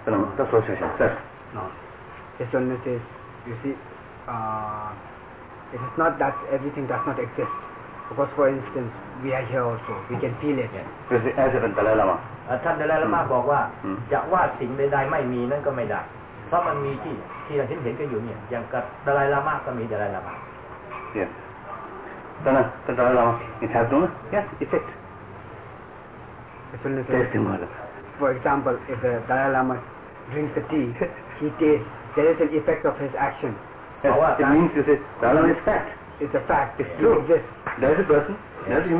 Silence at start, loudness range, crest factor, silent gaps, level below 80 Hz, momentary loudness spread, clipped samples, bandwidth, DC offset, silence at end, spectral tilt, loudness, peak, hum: 0 s; 8 LU; 16 dB; none; -50 dBFS; 18 LU; under 0.1%; 4 kHz; under 0.1%; 0 s; -11 dB/octave; -24 LUFS; -8 dBFS; none